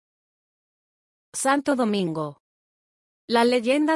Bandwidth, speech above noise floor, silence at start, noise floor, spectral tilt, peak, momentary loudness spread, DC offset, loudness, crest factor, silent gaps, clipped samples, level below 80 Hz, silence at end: 12 kHz; over 68 dB; 1.35 s; under -90 dBFS; -4 dB/octave; -8 dBFS; 12 LU; under 0.1%; -23 LUFS; 18 dB; 2.40-3.28 s; under 0.1%; -74 dBFS; 0 s